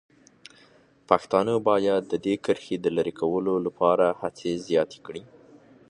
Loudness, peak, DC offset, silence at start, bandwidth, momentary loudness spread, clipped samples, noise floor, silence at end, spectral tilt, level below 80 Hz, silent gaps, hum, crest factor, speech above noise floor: -25 LUFS; -2 dBFS; under 0.1%; 1.1 s; 10.5 kHz; 9 LU; under 0.1%; -57 dBFS; 0.65 s; -6 dB/octave; -64 dBFS; none; none; 24 dB; 33 dB